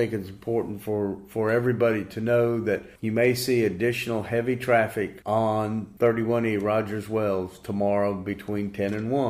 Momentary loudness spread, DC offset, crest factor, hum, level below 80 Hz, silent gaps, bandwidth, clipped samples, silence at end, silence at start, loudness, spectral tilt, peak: 8 LU; under 0.1%; 16 dB; none; -58 dBFS; none; 15.5 kHz; under 0.1%; 0 s; 0 s; -26 LUFS; -6.5 dB/octave; -8 dBFS